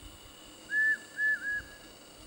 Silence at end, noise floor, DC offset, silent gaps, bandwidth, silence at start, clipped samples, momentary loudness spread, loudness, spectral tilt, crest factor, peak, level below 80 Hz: 0 s; -52 dBFS; under 0.1%; none; 16.5 kHz; 0 s; under 0.1%; 22 LU; -30 LUFS; -1.5 dB/octave; 12 dB; -22 dBFS; -60 dBFS